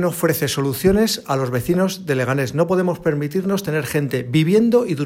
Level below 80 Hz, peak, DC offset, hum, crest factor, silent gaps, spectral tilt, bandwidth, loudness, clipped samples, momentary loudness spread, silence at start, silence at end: -44 dBFS; -2 dBFS; under 0.1%; none; 16 dB; none; -5.5 dB/octave; 16.5 kHz; -19 LUFS; under 0.1%; 6 LU; 0 s; 0 s